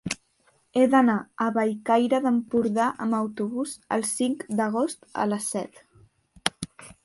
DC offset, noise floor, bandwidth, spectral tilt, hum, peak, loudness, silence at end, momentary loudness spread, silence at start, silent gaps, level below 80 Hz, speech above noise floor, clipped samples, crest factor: under 0.1%; -65 dBFS; 11.5 kHz; -4.5 dB/octave; none; -2 dBFS; -25 LUFS; 0.15 s; 11 LU; 0.05 s; none; -64 dBFS; 41 dB; under 0.1%; 24 dB